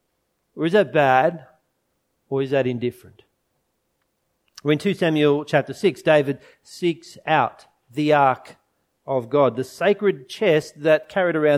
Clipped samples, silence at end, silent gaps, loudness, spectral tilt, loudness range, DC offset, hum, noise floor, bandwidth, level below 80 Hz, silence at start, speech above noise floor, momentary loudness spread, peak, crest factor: under 0.1%; 0 s; none; -21 LUFS; -6.5 dB/octave; 5 LU; under 0.1%; none; -72 dBFS; 14.5 kHz; -68 dBFS; 0.55 s; 52 dB; 10 LU; -2 dBFS; 20 dB